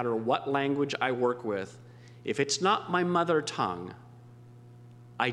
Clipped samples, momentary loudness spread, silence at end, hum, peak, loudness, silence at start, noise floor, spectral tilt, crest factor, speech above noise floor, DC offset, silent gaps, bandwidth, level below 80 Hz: under 0.1%; 15 LU; 0 s; 60 Hz at -55 dBFS; -10 dBFS; -29 LUFS; 0 s; -51 dBFS; -4.5 dB/octave; 20 dB; 22 dB; under 0.1%; none; 11.5 kHz; -74 dBFS